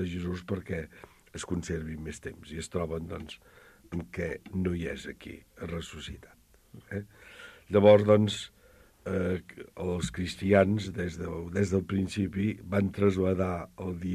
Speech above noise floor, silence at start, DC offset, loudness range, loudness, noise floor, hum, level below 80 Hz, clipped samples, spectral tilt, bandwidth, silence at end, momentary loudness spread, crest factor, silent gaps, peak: 29 dB; 0 s; under 0.1%; 10 LU; -30 LUFS; -59 dBFS; none; -52 dBFS; under 0.1%; -6.5 dB/octave; 14 kHz; 0 s; 20 LU; 22 dB; none; -8 dBFS